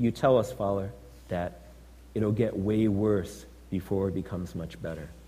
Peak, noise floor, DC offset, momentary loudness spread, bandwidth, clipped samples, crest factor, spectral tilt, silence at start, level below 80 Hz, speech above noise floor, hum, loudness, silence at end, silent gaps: -10 dBFS; -50 dBFS; under 0.1%; 14 LU; 15.5 kHz; under 0.1%; 18 dB; -8 dB/octave; 0 s; -50 dBFS; 22 dB; none; -29 LUFS; 0 s; none